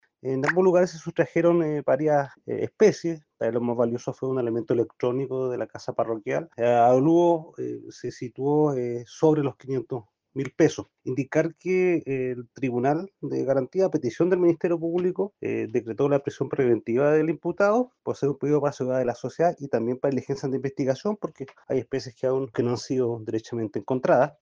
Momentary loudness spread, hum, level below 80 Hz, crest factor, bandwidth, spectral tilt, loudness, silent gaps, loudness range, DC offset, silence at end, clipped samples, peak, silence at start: 10 LU; none; -68 dBFS; 18 dB; 7.6 kHz; -7 dB/octave; -25 LUFS; none; 4 LU; under 0.1%; 0.1 s; under 0.1%; -6 dBFS; 0.25 s